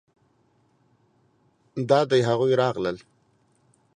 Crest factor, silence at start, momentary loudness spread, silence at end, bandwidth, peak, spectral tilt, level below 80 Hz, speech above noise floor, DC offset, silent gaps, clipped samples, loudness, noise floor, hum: 22 dB; 1.75 s; 16 LU; 1 s; 9.8 kHz; -4 dBFS; -6.5 dB/octave; -66 dBFS; 43 dB; under 0.1%; none; under 0.1%; -23 LUFS; -65 dBFS; none